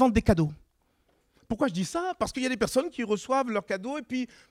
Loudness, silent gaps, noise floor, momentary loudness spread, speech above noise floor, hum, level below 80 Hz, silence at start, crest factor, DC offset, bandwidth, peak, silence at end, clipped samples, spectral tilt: -29 LUFS; none; -69 dBFS; 8 LU; 42 dB; none; -44 dBFS; 0 s; 22 dB; under 0.1%; 16 kHz; -6 dBFS; 0.25 s; under 0.1%; -5.5 dB/octave